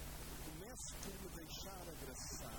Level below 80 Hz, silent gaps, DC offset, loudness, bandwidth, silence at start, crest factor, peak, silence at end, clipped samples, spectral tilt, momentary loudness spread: -56 dBFS; none; under 0.1%; -50 LUFS; 18 kHz; 0 s; 16 dB; -34 dBFS; 0 s; under 0.1%; -3 dB/octave; 3 LU